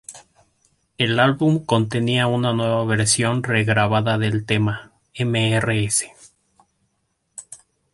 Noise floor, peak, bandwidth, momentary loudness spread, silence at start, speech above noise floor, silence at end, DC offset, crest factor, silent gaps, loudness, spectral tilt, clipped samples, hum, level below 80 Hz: -71 dBFS; -2 dBFS; 11.5 kHz; 18 LU; 0.1 s; 52 dB; 0.4 s; under 0.1%; 18 dB; none; -19 LUFS; -4.5 dB/octave; under 0.1%; none; -52 dBFS